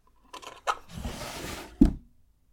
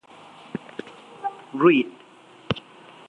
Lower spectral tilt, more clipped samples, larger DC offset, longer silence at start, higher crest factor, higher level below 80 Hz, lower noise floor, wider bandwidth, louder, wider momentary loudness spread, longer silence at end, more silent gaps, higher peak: second, -5.5 dB/octave vs -7 dB/octave; neither; neither; second, 0.35 s vs 0.55 s; about the same, 26 dB vs 22 dB; first, -36 dBFS vs -62 dBFS; first, -59 dBFS vs -50 dBFS; first, 18.5 kHz vs 8.8 kHz; second, -30 LUFS vs -24 LUFS; about the same, 20 LU vs 21 LU; about the same, 0.5 s vs 0.5 s; neither; about the same, -4 dBFS vs -4 dBFS